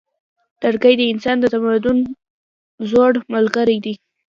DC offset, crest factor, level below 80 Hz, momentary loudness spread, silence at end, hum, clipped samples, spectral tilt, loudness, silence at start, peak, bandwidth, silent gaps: under 0.1%; 16 dB; -54 dBFS; 12 LU; 0.35 s; none; under 0.1%; -6 dB/octave; -16 LUFS; 0.6 s; 0 dBFS; 7.2 kHz; 2.30-2.78 s